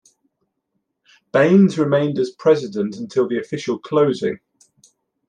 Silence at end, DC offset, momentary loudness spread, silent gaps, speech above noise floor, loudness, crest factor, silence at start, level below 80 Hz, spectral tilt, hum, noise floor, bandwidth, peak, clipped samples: 0.9 s; under 0.1%; 11 LU; none; 57 dB; -18 LUFS; 18 dB; 1.35 s; -66 dBFS; -7 dB/octave; none; -74 dBFS; 9.4 kHz; -2 dBFS; under 0.1%